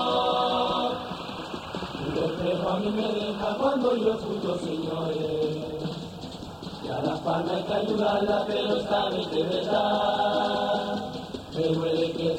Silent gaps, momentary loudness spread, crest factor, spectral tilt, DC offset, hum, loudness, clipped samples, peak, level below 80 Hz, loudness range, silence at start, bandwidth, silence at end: none; 11 LU; 16 dB; -6 dB/octave; under 0.1%; none; -27 LUFS; under 0.1%; -12 dBFS; -54 dBFS; 4 LU; 0 s; 16 kHz; 0 s